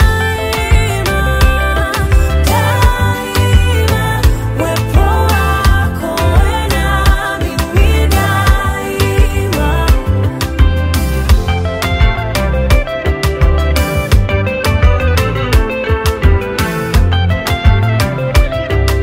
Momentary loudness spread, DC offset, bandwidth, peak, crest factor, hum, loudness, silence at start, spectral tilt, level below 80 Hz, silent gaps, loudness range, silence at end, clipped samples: 4 LU; under 0.1%; 16.5 kHz; 0 dBFS; 10 dB; none; -13 LUFS; 0 s; -5.5 dB/octave; -14 dBFS; none; 1 LU; 0 s; under 0.1%